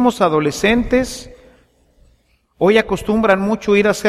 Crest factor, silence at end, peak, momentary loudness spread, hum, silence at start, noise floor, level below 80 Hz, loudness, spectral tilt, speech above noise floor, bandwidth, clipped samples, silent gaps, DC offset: 16 dB; 0 s; -2 dBFS; 4 LU; none; 0 s; -58 dBFS; -38 dBFS; -16 LUFS; -5 dB/octave; 43 dB; 14.5 kHz; under 0.1%; none; under 0.1%